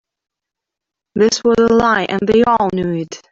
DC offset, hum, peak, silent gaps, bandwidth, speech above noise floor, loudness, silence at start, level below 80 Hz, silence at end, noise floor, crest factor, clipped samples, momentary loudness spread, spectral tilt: under 0.1%; none; -2 dBFS; none; 7.8 kHz; 69 dB; -14 LUFS; 1.15 s; -46 dBFS; 0.15 s; -83 dBFS; 14 dB; under 0.1%; 9 LU; -5 dB/octave